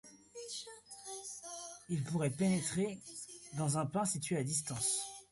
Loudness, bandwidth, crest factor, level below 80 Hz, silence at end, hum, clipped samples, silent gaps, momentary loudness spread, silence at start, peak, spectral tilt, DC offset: -37 LUFS; 12 kHz; 16 dB; -72 dBFS; 0.05 s; none; under 0.1%; none; 13 LU; 0.05 s; -22 dBFS; -4.5 dB/octave; under 0.1%